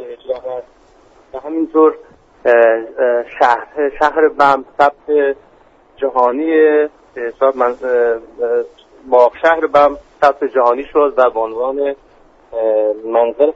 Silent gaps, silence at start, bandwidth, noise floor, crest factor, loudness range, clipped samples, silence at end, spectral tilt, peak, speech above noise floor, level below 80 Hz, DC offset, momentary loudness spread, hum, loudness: none; 0 s; 7.6 kHz; -48 dBFS; 14 dB; 2 LU; under 0.1%; 0 s; -5.5 dB/octave; 0 dBFS; 34 dB; -50 dBFS; under 0.1%; 13 LU; none; -14 LUFS